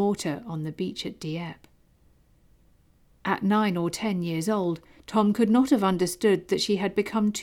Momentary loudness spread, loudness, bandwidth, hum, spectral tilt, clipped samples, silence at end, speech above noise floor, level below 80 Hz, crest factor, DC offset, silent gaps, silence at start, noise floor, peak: 12 LU; -26 LUFS; 16.5 kHz; none; -5.5 dB/octave; under 0.1%; 0 s; 35 dB; -60 dBFS; 16 dB; under 0.1%; none; 0 s; -60 dBFS; -10 dBFS